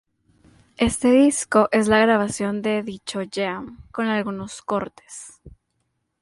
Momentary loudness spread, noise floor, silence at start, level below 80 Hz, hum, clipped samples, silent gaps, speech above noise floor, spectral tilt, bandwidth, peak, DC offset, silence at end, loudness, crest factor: 17 LU; -73 dBFS; 0.8 s; -50 dBFS; none; under 0.1%; none; 52 dB; -4.5 dB/octave; 11.5 kHz; -4 dBFS; under 0.1%; 0.75 s; -21 LUFS; 20 dB